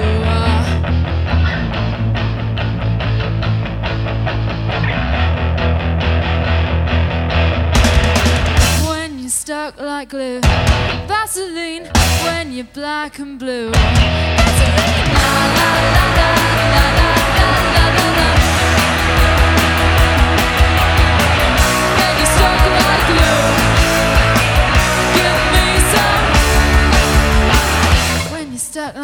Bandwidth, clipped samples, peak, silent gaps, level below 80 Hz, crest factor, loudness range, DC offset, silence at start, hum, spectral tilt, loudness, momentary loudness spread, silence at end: over 20 kHz; under 0.1%; 0 dBFS; none; -18 dBFS; 14 dB; 6 LU; under 0.1%; 0 s; none; -4.5 dB/octave; -14 LUFS; 8 LU; 0 s